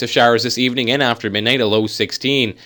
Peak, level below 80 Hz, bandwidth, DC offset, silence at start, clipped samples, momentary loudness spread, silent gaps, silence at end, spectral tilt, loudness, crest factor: 0 dBFS; -60 dBFS; 19.5 kHz; under 0.1%; 0 s; under 0.1%; 4 LU; none; 0.15 s; -4 dB/octave; -16 LUFS; 16 dB